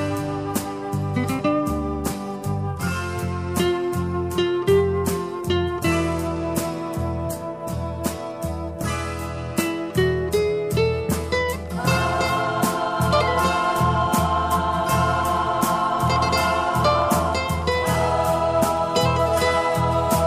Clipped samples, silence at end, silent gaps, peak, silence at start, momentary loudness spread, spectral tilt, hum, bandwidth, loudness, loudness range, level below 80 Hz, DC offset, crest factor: under 0.1%; 0 s; none; -8 dBFS; 0 s; 8 LU; -5.5 dB/octave; none; 15.5 kHz; -22 LUFS; 5 LU; -36 dBFS; under 0.1%; 14 dB